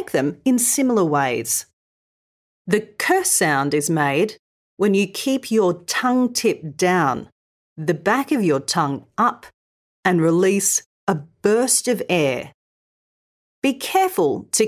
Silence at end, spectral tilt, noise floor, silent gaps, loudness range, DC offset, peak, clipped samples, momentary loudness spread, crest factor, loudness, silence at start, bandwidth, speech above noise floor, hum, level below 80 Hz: 0 s; -4 dB/octave; under -90 dBFS; 1.73-2.65 s, 4.39-4.77 s, 7.32-7.76 s, 9.54-10.03 s, 10.86-11.07 s, 12.54-13.62 s; 2 LU; under 0.1%; -4 dBFS; under 0.1%; 7 LU; 18 dB; -19 LUFS; 0 s; 16 kHz; over 71 dB; none; -64 dBFS